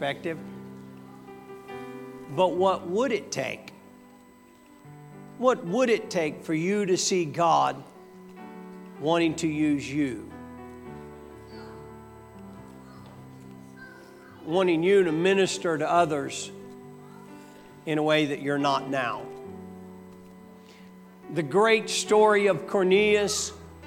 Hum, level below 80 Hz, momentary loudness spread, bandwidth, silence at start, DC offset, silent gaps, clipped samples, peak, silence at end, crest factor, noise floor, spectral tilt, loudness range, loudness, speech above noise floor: none; -64 dBFS; 25 LU; 17 kHz; 0 s; under 0.1%; none; under 0.1%; -8 dBFS; 0 s; 20 dB; -53 dBFS; -4.5 dB/octave; 8 LU; -25 LUFS; 29 dB